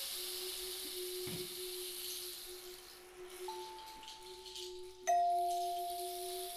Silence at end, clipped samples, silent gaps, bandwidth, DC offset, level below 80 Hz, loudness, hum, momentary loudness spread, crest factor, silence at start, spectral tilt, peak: 0 s; under 0.1%; none; 15.5 kHz; under 0.1%; -70 dBFS; -41 LUFS; none; 15 LU; 18 dB; 0 s; -2 dB/octave; -24 dBFS